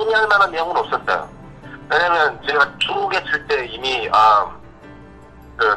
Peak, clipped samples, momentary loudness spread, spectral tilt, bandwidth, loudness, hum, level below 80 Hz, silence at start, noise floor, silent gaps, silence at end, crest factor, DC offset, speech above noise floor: -2 dBFS; under 0.1%; 9 LU; -3.5 dB/octave; 12 kHz; -17 LUFS; none; -48 dBFS; 0 s; -41 dBFS; none; 0 s; 18 dB; under 0.1%; 24 dB